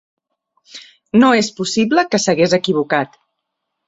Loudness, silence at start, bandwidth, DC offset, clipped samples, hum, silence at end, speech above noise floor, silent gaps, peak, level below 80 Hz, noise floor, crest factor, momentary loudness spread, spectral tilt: -15 LUFS; 0.75 s; 8 kHz; under 0.1%; under 0.1%; none; 0.8 s; 61 dB; none; -2 dBFS; -58 dBFS; -76 dBFS; 16 dB; 20 LU; -4.5 dB/octave